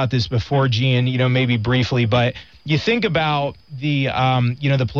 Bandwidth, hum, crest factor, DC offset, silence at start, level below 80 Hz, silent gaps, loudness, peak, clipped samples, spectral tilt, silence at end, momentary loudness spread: 7 kHz; none; 14 dB; 0.3%; 0 s; -46 dBFS; none; -19 LUFS; -4 dBFS; under 0.1%; -7 dB/octave; 0 s; 5 LU